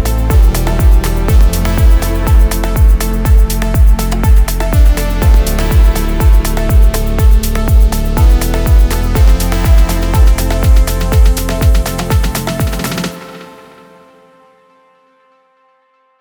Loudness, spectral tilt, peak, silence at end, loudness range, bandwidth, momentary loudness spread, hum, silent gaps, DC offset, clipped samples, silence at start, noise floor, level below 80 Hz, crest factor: -12 LUFS; -5.5 dB/octave; 0 dBFS; 2.75 s; 7 LU; over 20 kHz; 3 LU; none; none; under 0.1%; under 0.1%; 0 s; -54 dBFS; -10 dBFS; 10 dB